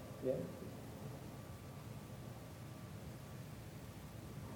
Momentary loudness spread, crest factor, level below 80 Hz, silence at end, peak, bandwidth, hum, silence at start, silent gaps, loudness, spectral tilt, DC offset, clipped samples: 10 LU; 22 dB; -64 dBFS; 0 s; -26 dBFS; 19.5 kHz; none; 0 s; none; -50 LUFS; -6.5 dB/octave; under 0.1%; under 0.1%